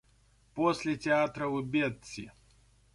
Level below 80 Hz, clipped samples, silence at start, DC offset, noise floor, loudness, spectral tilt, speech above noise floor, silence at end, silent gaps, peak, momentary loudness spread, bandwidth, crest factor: -64 dBFS; under 0.1%; 0.55 s; under 0.1%; -65 dBFS; -31 LUFS; -5.5 dB/octave; 34 dB; 0.65 s; none; -14 dBFS; 16 LU; 11.5 kHz; 18 dB